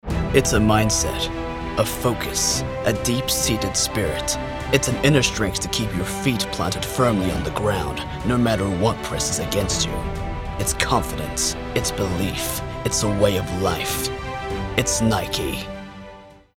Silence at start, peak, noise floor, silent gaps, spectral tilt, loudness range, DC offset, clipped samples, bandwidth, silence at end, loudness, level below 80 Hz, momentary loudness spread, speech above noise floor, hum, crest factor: 0.05 s; -2 dBFS; -43 dBFS; none; -4 dB/octave; 2 LU; under 0.1%; under 0.1%; 17 kHz; 0.25 s; -22 LUFS; -34 dBFS; 8 LU; 22 dB; none; 20 dB